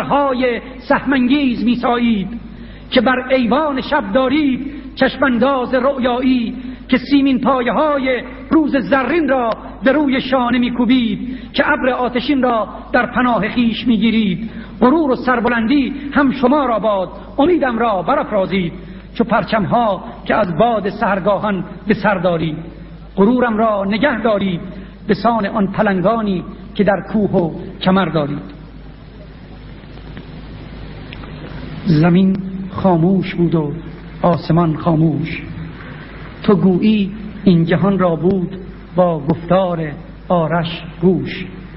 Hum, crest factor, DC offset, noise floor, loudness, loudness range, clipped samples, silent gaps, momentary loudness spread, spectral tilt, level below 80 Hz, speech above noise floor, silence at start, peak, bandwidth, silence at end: none; 16 dB; under 0.1%; -35 dBFS; -16 LUFS; 3 LU; under 0.1%; none; 16 LU; -12 dB/octave; -38 dBFS; 20 dB; 0 s; 0 dBFS; 5.8 kHz; 0 s